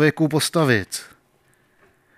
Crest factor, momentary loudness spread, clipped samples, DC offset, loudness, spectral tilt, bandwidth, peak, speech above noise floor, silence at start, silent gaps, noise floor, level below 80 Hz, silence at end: 18 dB; 13 LU; under 0.1%; under 0.1%; -20 LUFS; -5 dB/octave; 16 kHz; -4 dBFS; 41 dB; 0 s; none; -61 dBFS; -62 dBFS; 1.1 s